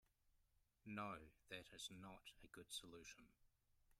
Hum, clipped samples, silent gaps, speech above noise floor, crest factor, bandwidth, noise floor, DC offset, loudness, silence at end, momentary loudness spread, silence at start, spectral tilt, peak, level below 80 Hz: none; under 0.1%; none; 25 dB; 22 dB; 15.5 kHz; -82 dBFS; under 0.1%; -56 LUFS; 0.05 s; 11 LU; 0.25 s; -3 dB/octave; -38 dBFS; -78 dBFS